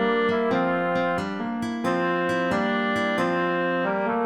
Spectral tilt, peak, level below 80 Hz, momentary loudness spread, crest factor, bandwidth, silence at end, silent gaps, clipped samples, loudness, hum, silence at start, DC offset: -6 dB/octave; -12 dBFS; -62 dBFS; 5 LU; 12 dB; 13.5 kHz; 0 s; none; under 0.1%; -24 LUFS; none; 0 s; under 0.1%